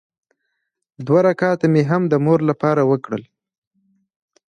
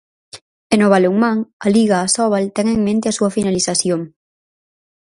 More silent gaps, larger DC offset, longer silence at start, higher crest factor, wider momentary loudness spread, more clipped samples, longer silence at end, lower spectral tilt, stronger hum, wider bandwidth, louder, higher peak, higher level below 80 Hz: second, none vs 0.41-0.70 s, 1.53-1.60 s; neither; first, 1 s vs 0.35 s; about the same, 16 dB vs 16 dB; first, 10 LU vs 6 LU; neither; first, 1.25 s vs 0.95 s; first, -9 dB/octave vs -4.5 dB/octave; neither; second, 9.4 kHz vs 11.5 kHz; about the same, -17 LUFS vs -16 LUFS; about the same, -2 dBFS vs 0 dBFS; second, -64 dBFS vs -52 dBFS